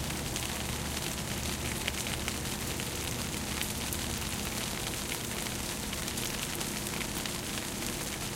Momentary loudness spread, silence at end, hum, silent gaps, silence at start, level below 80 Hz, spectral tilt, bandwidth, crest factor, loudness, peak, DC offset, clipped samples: 1 LU; 0 s; none; none; 0 s; -46 dBFS; -2.5 dB/octave; 17 kHz; 24 dB; -34 LUFS; -12 dBFS; under 0.1%; under 0.1%